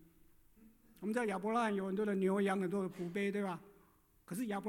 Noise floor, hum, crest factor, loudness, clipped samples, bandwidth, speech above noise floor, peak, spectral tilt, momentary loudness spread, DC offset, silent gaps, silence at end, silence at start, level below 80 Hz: -69 dBFS; none; 16 dB; -37 LUFS; under 0.1%; 17 kHz; 32 dB; -24 dBFS; -6.5 dB/octave; 9 LU; under 0.1%; none; 0 s; 0.6 s; -74 dBFS